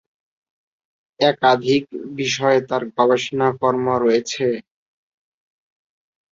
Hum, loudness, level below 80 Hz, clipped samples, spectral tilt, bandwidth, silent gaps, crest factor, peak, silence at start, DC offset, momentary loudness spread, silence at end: none; -19 LUFS; -62 dBFS; under 0.1%; -4.5 dB/octave; 7.8 kHz; none; 20 dB; -2 dBFS; 1.2 s; under 0.1%; 7 LU; 1.7 s